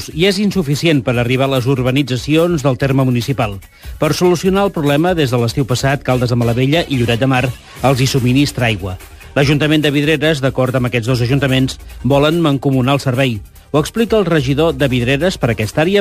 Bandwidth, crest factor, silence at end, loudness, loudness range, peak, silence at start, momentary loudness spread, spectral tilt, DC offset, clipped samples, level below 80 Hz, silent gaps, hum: 15.5 kHz; 14 dB; 0 s; -14 LUFS; 1 LU; 0 dBFS; 0 s; 5 LU; -6 dB/octave; under 0.1%; under 0.1%; -36 dBFS; none; none